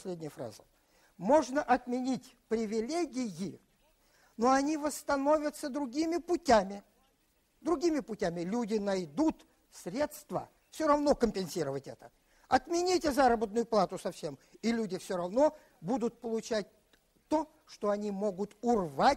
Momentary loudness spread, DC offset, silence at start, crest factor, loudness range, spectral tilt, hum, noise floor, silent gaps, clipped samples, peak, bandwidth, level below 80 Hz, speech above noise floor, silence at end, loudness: 14 LU; under 0.1%; 0 s; 20 dB; 3 LU; -5 dB/octave; none; -72 dBFS; none; under 0.1%; -12 dBFS; 16 kHz; -60 dBFS; 41 dB; 0 s; -32 LUFS